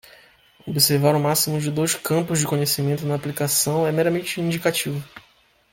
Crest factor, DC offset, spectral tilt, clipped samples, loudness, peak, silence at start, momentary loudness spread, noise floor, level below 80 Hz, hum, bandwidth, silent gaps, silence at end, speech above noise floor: 20 dB; under 0.1%; -4 dB/octave; under 0.1%; -21 LUFS; -2 dBFS; 0.65 s; 7 LU; -58 dBFS; -58 dBFS; none; 17 kHz; none; 0.55 s; 37 dB